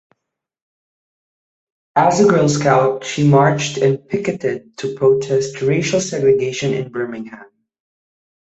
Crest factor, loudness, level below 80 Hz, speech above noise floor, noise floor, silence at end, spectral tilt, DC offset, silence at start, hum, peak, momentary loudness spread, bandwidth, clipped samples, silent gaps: 16 dB; -16 LUFS; -56 dBFS; 63 dB; -79 dBFS; 1.05 s; -5.5 dB/octave; under 0.1%; 1.95 s; none; -2 dBFS; 12 LU; 8.2 kHz; under 0.1%; none